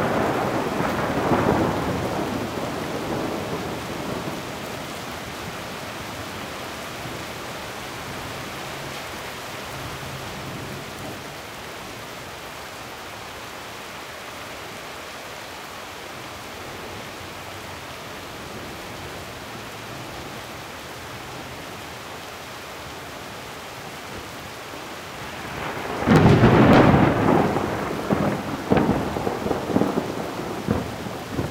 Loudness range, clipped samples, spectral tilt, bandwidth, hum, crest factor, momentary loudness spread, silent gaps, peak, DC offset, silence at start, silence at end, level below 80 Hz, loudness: 16 LU; under 0.1%; -6 dB/octave; 16 kHz; none; 22 dB; 15 LU; none; -4 dBFS; under 0.1%; 0 s; 0 s; -46 dBFS; -26 LUFS